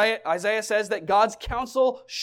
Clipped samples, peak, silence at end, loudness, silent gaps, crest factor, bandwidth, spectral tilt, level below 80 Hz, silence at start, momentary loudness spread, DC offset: under 0.1%; -8 dBFS; 0 s; -24 LUFS; none; 16 dB; 16.5 kHz; -3 dB/octave; -46 dBFS; 0 s; 4 LU; under 0.1%